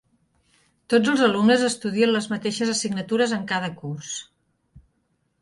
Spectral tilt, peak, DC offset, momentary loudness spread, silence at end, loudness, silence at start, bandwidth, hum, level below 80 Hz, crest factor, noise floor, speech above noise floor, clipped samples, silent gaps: -4 dB/octave; -6 dBFS; under 0.1%; 13 LU; 0.65 s; -22 LUFS; 0.9 s; 11.5 kHz; none; -64 dBFS; 18 dB; -70 dBFS; 49 dB; under 0.1%; none